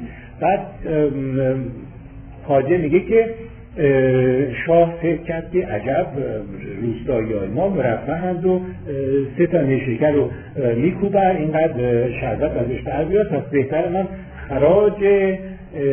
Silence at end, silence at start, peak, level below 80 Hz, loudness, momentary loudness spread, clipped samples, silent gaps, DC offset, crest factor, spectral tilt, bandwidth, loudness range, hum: 0 s; 0 s; -4 dBFS; -40 dBFS; -19 LUFS; 11 LU; under 0.1%; none; under 0.1%; 16 dB; -12 dB/octave; 3.5 kHz; 4 LU; none